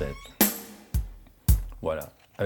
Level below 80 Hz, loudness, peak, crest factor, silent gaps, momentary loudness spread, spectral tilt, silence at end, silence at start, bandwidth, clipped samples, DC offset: -32 dBFS; -28 LUFS; -6 dBFS; 24 dB; none; 14 LU; -4.5 dB/octave; 0 s; 0 s; 19 kHz; under 0.1%; under 0.1%